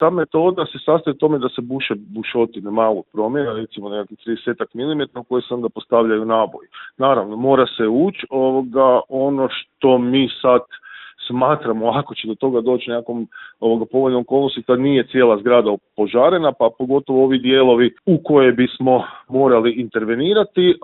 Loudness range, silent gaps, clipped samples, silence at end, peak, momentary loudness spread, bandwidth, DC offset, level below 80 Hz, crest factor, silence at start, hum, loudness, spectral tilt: 7 LU; none; under 0.1%; 0.05 s; 0 dBFS; 10 LU; 4.2 kHz; under 0.1%; -60 dBFS; 16 dB; 0 s; none; -17 LUFS; -11 dB/octave